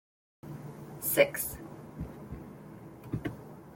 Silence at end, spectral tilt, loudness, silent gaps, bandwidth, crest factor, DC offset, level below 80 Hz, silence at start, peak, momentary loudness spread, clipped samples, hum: 0 s; -4 dB/octave; -32 LUFS; none; 17 kHz; 28 dB; under 0.1%; -56 dBFS; 0.45 s; -8 dBFS; 22 LU; under 0.1%; none